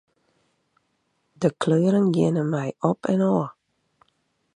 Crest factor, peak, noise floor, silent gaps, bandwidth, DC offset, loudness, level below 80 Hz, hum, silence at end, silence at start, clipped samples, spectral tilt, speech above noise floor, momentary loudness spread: 20 dB; -6 dBFS; -72 dBFS; none; 10 kHz; under 0.1%; -23 LUFS; -66 dBFS; none; 1.05 s; 1.4 s; under 0.1%; -8 dB/octave; 50 dB; 6 LU